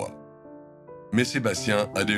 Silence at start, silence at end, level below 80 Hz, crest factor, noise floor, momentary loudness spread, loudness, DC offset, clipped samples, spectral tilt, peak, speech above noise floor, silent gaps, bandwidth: 0 s; 0 s; -62 dBFS; 20 dB; -47 dBFS; 22 LU; -26 LUFS; under 0.1%; under 0.1%; -4.5 dB/octave; -8 dBFS; 22 dB; none; 14.5 kHz